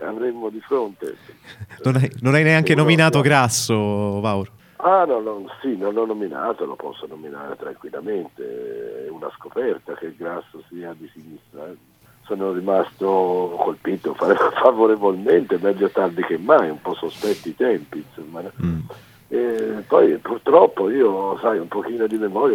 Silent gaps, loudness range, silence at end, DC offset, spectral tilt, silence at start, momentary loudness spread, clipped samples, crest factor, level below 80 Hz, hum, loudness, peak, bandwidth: none; 12 LU; 0 s; under 0.1%; -5.5 dB/octave; 0 s; 19 LU; under 0.1%; 20 dB; -58 dBFS; none; -19 LUFS; 0 dBFS; 17 kHz